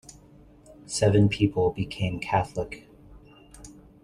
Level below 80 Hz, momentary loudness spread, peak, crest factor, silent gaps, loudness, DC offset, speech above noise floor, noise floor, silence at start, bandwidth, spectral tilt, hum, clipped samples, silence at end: -50 dBFS; 25 LU; -8 dBFS; 20 dB; none; -25 LUFS; under 0.1%; 28 dB; -53 dBFS; 0.1 s; 11.5 kHz; -6 dB/octave; none; under 0.1%; 0.3 s